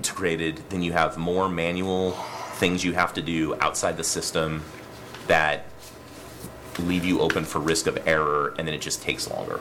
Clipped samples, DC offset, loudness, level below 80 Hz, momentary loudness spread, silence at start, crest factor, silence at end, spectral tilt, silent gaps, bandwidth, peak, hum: under 0.1%; under 0.1%; -25 LUFS; -50 dBFS; 18 LU; 0 s; 20 dB; 0 s; -4 dB/octave; none; 18 kHz; -6 dBFS; none